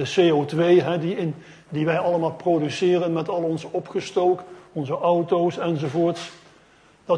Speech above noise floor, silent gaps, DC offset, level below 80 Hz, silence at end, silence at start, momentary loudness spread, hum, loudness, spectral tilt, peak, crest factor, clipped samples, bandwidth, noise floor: 33 dB; none; under 0.1%; -66 dBFS; 0 s; 0 s; 11 LU; none; -22 LUFS; -6.5 dB/octave; -6 dBFS; 16 dB; under 0.1%; 10.5 kHz; -55 dBFS